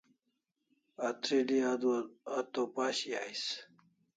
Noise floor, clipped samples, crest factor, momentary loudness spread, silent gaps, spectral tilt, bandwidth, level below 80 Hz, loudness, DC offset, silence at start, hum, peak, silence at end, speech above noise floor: -84 dBFS; under 0.1%; 18 dB; 8 LU; none; -3 dB/octave; 9.4 kHz; -84 dBFS; -35 LUFS; under 0.1%; 1 s; none; -18 dBFS; 0.55 s; 49 dB